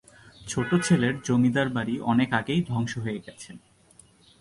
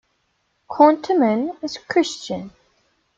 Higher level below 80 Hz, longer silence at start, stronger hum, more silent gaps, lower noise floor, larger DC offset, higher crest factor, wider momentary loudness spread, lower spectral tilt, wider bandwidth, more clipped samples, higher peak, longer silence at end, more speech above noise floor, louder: first, -56 dBFS vs -64 dBFS; second, 0.4 s vs 0.7 s; neither; neither; second, -57 dBFS vs -69 dBFS; neither; about the same, 18 dB vs 20 dB; first, 19 LU vs 16 LU; about the same, -5.5 dB/octave vs -5 dB/octave; first, 11.5 kHz vs 7.8 kHz; neither; second, -8 dBFS vs -2 dBFS; first, 0.85 s vs 0.7 s; second, 32 dB vs 50 dB; second, -25 LUFS vs -19 LUFS